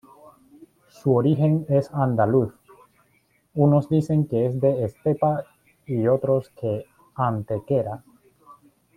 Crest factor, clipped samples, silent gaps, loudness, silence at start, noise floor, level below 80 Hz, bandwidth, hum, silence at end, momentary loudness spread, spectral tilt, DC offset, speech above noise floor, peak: 18 dB; under 0.1%; none; -23 LUFS; 1.05 s; -64 dBFS; -60 dBFS; 10 kHz; none; 0.45 s; 11 LU; -10 dB/octave; under 0.1%; 43 dB; -6 dBFS